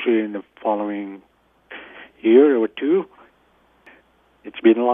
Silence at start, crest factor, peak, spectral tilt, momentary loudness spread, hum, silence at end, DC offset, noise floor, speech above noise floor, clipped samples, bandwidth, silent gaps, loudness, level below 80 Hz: 0 s; 20 dB; -2 dBFS; -9 dB/octave; 24 LU; none; 0 s; under 0.1%; -59 dBFS; 41 dB; under 0.1%; 3.7 kHz; none; -19 LUFS; -68 dBFS